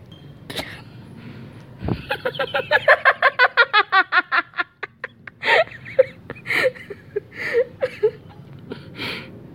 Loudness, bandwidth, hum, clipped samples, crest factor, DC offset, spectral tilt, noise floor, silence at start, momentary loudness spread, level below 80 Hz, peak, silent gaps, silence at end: -19 LUFS; 16 kHz; none; under 0.1%; 22 dB; under 0.1%; -4.5 dB/octave; -41 dBFS; 0.1 s; 22 LU; -50 dBFS; 0 dBFS; none; 0 s